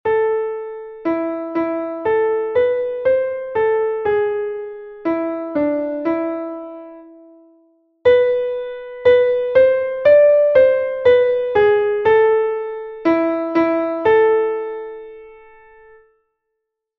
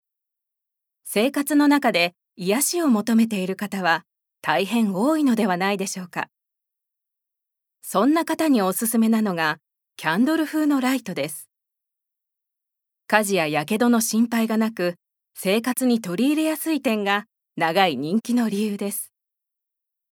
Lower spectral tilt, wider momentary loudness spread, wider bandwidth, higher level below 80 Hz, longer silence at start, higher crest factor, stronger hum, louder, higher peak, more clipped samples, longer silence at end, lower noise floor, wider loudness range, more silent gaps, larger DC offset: first, -7.5 dB/octave vs -4 dB/octave; first, 14 LU vs 9 LU; second, 4.9 kHz vs 19.5 kHz; first, -54 dBFS vs -80 dBFS; second, 0.05 s vs 1.05 s; second, 16 dB vs 22 dB; neither; first, -17 LUFS vs -22 LUFS; about the same, -2 dBFS vs 0 dBFS; neither; first, 1.65 s vs 1.1 s; second, -77 dBFS vs -84 dBFS; first, 8 LU vs 4 LU; neither; neither